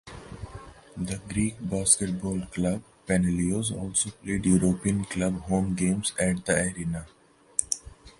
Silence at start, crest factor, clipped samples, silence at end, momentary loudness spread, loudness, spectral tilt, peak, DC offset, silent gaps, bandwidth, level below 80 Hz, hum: 0.05 s; 24 dB; under 0.1%; 0.1 s; 14 LU; -27 LUFS; -4.5 dB/octave; -4 dBFS; under 0.1%; none; 11.5 kHz; -46 dBFS; none